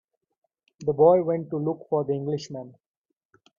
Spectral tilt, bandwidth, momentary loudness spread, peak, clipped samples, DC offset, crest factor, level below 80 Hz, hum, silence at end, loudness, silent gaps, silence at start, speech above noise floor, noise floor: -8 dB/octave; 7.4 kHz; 13 LU; -6 dBFS; under 0.1%; under 0.1%; 20 dB; -66 dBFS; none; 0.9 s; -24 LUFS; none; 0.8 s; 43 dB; -67 dBFS